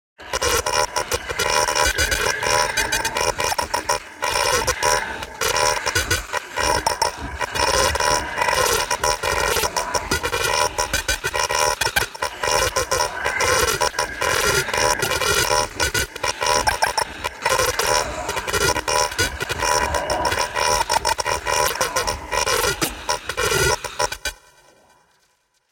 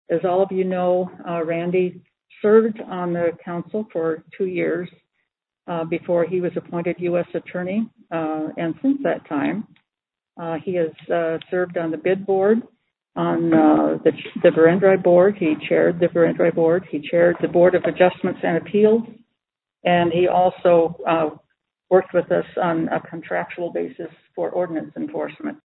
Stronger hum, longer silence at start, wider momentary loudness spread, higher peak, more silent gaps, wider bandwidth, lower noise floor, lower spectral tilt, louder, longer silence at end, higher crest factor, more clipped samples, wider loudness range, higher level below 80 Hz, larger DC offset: neither; about the same, 0.2 s vs 0.1 s; second, 6 LU vs 12 LU; about the same, -2 dBFS vs -2 dBFS; neither; first, 17 kHz vs 4.1 kHz; second, -65 dBFS vs -88 dBFS; second, -1.5 dB/octave vs -11.5 dB/octave; about the same, -20 LUFS vs -20 LUFS; first, 1.35 s vs 0.1 s; about the same, 20 dB vs 20 dB; neither; second, 1 LU vs 8 LU; first, -38 dBFS vs -64 dBFS; neither